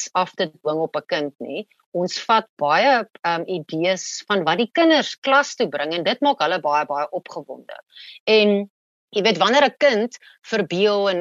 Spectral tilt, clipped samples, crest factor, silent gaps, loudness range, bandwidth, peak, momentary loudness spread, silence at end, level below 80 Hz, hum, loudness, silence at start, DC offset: -4 dB/octave; under 0.1%; 18 dB; 1.86-1.92 s, 2.49-2.57 s, 5.18-5.22 s, 8.20-8.26 s, 8.70-9.08 s; 2 LU; 8 kHz; -4 dBFS; 15 LU; 0 s; -76 dBFS; none; -20 LUFS; 0 s; under 0.1%